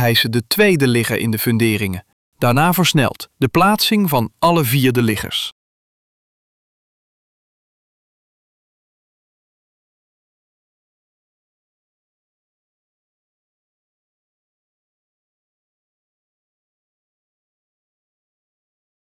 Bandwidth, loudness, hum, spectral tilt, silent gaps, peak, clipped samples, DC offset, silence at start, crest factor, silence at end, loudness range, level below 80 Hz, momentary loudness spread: 17 kHz; -16 LUFS; none; -5 dB/octave; 2.13-2.32 s; -4 dBFS; under 0.1%; under 0.1%; 0 s; 18 dB; 13.7 s; 9 LU; -54 dBFS; 8 LU